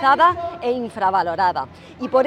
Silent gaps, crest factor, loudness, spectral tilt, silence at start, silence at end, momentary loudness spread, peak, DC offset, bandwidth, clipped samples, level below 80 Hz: none; 16 dB; -20 LUFS; -5.5 dB/octave; 0 s; 0 s; 14 LU; -4 dBFS; under 0.1%; 10.5 kHz; under 0.1%; -56 dBFS